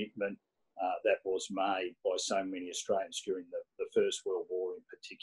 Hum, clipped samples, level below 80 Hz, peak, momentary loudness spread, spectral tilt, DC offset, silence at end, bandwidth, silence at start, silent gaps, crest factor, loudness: none; under 0.1%; -78 dBFS; -16 dBFS; 9 LU; -2.5 dB/octave; under 0.1%; 0.05 s; 12 kHz; 0 s; none; 20 dB; -35 LUFS